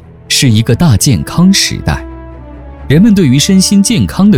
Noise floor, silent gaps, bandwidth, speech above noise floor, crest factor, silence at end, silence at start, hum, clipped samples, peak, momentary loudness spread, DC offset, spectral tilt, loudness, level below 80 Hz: -28 dBFS; none; 16.5 kHz; 21 dB; 8 dB; 0 s; 0.3 s; none; under 0.1%; 0 dBFS; 10 LU; under 0.1%; -5 dB/octave; -8 LUFS; -28 dBFS